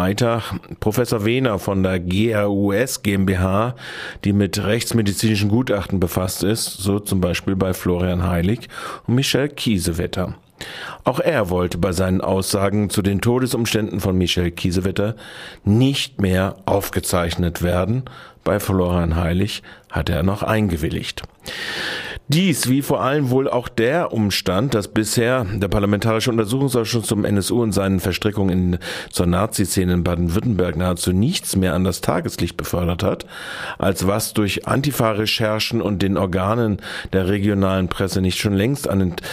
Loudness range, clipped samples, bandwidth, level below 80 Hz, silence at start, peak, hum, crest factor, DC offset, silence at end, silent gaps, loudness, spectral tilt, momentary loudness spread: 2 LU; under 0.1%; 15.5 kHz; -38 dBFS; 0 s; -2 dBFS; none; 16 dB; under 0.1%; 0 s; none; -20 LUFS; -5.5 dB/octave; 6 LU